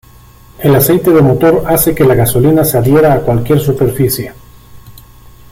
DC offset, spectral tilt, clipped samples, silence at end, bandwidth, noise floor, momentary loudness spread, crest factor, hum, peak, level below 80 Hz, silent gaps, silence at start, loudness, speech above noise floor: under 0.1%; -6.5 dB/octave; under 0.1%; 0.6 s; 17 kHz; -38 dBFS; 6 LU; 10 dB; none; 0 dBFS; -32 dBFS; none; 0.6 s; -10 LUFS; 30 dB